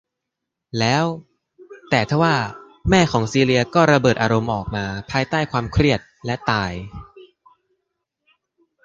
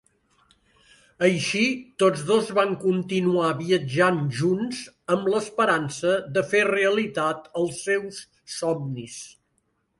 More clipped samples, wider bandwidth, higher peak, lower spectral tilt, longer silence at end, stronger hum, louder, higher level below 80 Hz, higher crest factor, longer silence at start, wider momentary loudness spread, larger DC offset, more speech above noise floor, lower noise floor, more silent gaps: neither; second, 9.8 kHz vs 11.5 kHz; first, -2 dBFS vs -6 dBFS; about the same, -5.5 dB/octave vs -5 dB/octave; first, 1.6 s vs 0.7 s; neither; first, -19 LUFS vs -24 LUFS; first, -40 dBFS vs -66 dBFS; about the same, 20 dB vs 18 dB; second, 0.75 s vs 1.2 s; about the same, 12 LU vs 12 LU; neither; first, 63 dB vs 48 dB; first, -82 dBFS vs -71 dBFS; neither